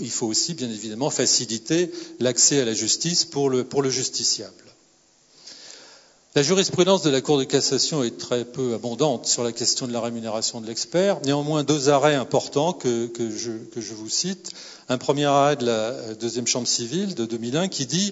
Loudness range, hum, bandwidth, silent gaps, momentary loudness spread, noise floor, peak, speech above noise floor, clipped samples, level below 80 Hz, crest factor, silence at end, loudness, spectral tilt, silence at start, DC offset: 3 LU; none; 8 kHz; none; 10 LU; -59 dBFS; -4 dBFS; 36 dB; under 0.1%; -68 dBFS; 18 dB; 0 s; -22 LUFS; -3.5 dB/octave; 0 s; under 0.1%